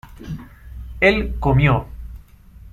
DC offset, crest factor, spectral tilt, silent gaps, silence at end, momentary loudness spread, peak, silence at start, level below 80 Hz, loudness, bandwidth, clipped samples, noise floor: under 0.1%; 18 dB; -8 dB/octave; none; 0.05 s; 22 LU; -2 dBFS; 0.05 s; -32 dBFS; -18 LUFS; 13.5 kHz; under 0.1%; -43 dBFS